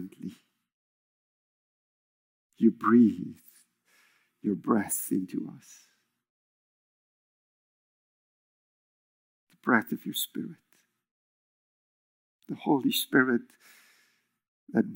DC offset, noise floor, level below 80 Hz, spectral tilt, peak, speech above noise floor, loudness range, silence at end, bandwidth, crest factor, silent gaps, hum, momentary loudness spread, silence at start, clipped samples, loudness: under 0.1%; -70 dBFS; -84 dBFS; -4.5 dB/octave; -6 dBFS; 43 dB; 7 LU; 0 s; 16.5 kHz; 26 dB; 0.72-2.50 s, 6.29-9.47 s, 11.11-12.39 s, 14.48-14.67 s; none; 20 LU; 0 s; under 0.1%; -27 LUFS